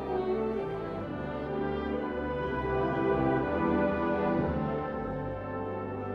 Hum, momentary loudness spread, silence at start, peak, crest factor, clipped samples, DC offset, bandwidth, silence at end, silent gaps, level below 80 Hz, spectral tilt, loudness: none; 8 LU; 0 s; -16 dBFS; 14 dB; under 0.1%; under 0.1%; 6.2 kHz; 0 s; none; -46 dBFS; -9.5 dB/octave; -31 LUFS